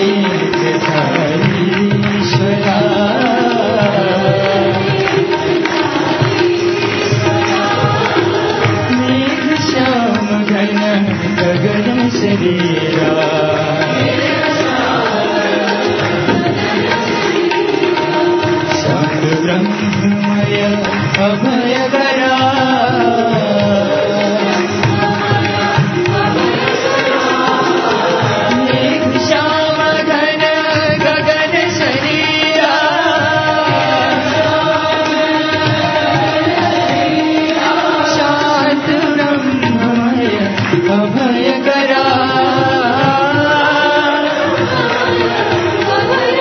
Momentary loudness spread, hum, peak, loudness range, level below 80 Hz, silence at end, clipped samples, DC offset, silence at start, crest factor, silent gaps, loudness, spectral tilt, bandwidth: 2 LU; none; 0 dBFS; 2 LU; -44 dBFS; 0 s; under 0.1%; under 0.1%; 0 s; 12 dB; none; -13 LUFS; -5.5 dB/octave; 6.6 kHz